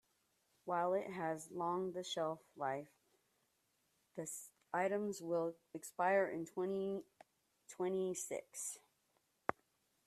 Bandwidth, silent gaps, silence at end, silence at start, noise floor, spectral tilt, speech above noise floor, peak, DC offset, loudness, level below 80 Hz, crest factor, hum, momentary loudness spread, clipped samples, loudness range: 14 kHz; none; 0.55 s; 0.65 s; -81 dBFS; -4 dB/octave; 41 dB; -16 dBFS; under 0.1%; -41 LUFS; -84 dBFS; 28 dB; none; 12 LU; under 0.1%; 5 LU